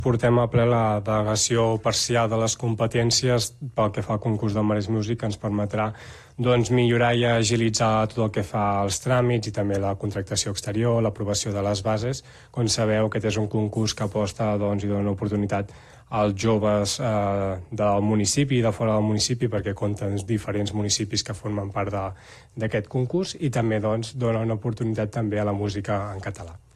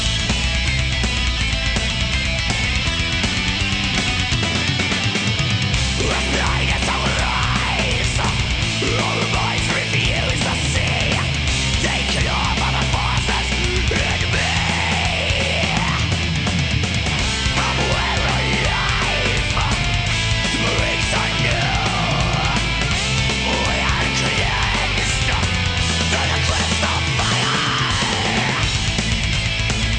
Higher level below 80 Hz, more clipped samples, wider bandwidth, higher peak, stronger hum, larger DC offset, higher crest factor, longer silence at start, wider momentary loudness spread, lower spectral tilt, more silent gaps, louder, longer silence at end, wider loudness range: second, -48 dBFS vs -26 dBFS; neither; first, 13 kHz vs 10 kHz; second, -8 dBFS vs -4 dBFS; neither; neither; about the same, 16 dB vs 14 dB; about the same, 0 s vs 0 s; first, 7 LU vs 2 LU; first, -5 dB/octave vs -3.5 dB/octave; neither; second, -24 LUFS vs -18 LUFS; first, 0.2 s vs 0 s; first, 4 LU vs 1 LU